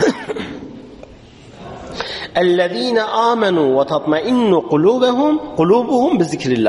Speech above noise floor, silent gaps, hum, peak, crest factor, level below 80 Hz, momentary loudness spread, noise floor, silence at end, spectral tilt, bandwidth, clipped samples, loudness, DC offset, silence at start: 26 dB; none; none; -2 dBFS; 14 dB; -50 dBFS; 16 LU; -40 dBFS; 0 s; -6 dB/octave; 11.5 kHz; under 0.1%; -16 LUFS; under 0.1%; 0 s